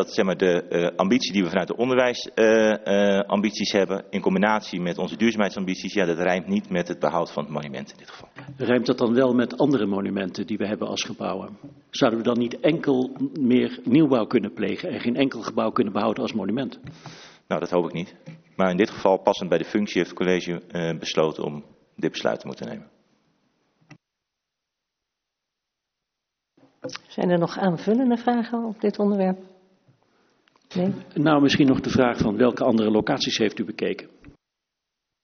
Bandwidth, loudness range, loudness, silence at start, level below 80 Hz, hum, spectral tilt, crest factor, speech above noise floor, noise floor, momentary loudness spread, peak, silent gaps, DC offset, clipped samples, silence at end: 6.6 kHz; 7 LU; -23 LUFS; 0 s; -60 dBFS; none; -4.5 dB/octave; 20 dB; 61 dB; -84 dBFS; 13 LU; -4 dBFS; none; under 0.1%; under 0.1%; 0.95 s